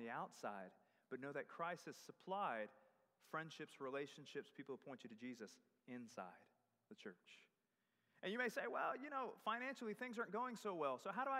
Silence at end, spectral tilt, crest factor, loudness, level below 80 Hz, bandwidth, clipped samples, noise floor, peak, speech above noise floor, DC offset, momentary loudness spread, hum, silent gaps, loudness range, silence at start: 0 s; -4.5 dB/octave; 20 dB; -49 LUFS; under -90 dBFS; 15.5 kHz; under 0.1%; -88 dBFS; -30 dBFS; 39 dB; under 0.1%; 14 LU; none; none; 11 LU; 0 s